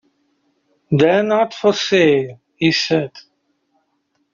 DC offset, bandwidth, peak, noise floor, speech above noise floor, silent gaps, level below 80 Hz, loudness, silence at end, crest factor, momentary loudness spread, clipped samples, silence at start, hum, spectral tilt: under 0.1%; 7.6 kHz; -2 dBFS; -67 dBFS; 52 dB; none; -60 dBFS; -16 LUFS; 1.15 s; 16 dB; 7 LU; under 0.1%; 0.9 s; none; -4 dB/octave